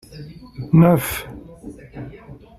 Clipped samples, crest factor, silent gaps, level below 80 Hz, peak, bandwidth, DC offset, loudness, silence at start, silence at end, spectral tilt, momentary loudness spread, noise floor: under 0.1%; 18 dB; none; -46 dBFS; -2 dBFS; 14.5 kHz; under 0.1%; -17 LUFS; 0.15 s; 0.25 s; -7 dB/octave; 25 LU; -41 dBFS